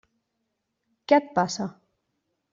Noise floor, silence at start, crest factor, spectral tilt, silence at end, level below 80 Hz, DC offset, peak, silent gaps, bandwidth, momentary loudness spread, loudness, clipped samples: -79 dBFS; 1.1 s; 22 dB; -4 dB/octave; 0.8 s; -72 dBFS; under 0.1%; -6 dBFS; none; 7.6 kHz; 15 LU; -24 LUFS; under 0.1%